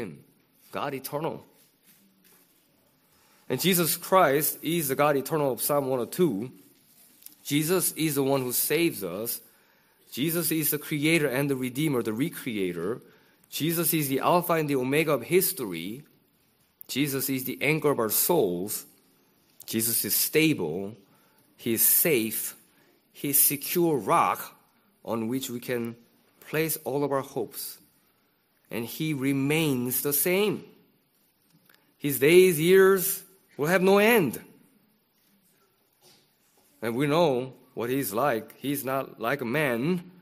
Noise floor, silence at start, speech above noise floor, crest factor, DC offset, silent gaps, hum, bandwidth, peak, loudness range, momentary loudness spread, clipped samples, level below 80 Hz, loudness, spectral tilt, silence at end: -68 dBFS; 0 s; 43 dB; 22 dB; under 0.1%; none; none; 15.5 kHz; -6 dBFS; 8 LU; 15 LU; under 0.1%; -70 dBFS; -25 LUFS; -4 dB/octave; 0.1 s